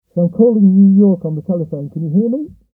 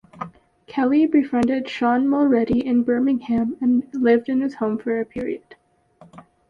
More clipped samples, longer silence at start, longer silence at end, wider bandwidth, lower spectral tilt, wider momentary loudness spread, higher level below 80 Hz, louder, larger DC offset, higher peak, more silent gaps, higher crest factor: neither; about the same, 0.15 s vs 0.15 s; about the same, 0.3 s vs 0.3 s; second, 1.3 kHz vs 7 kHz; first, -15.5 dB/octave vs -7.5 dB/octave; about the same, 13 LU vs 12 LU; about the same, -56 dBFS vs -54 dBFS; first, -14 LUFS vs -20 LUFS; neither; first, 0 dBFS vs -6 dBFS; neither; about the same, 12 dB vs 14 dB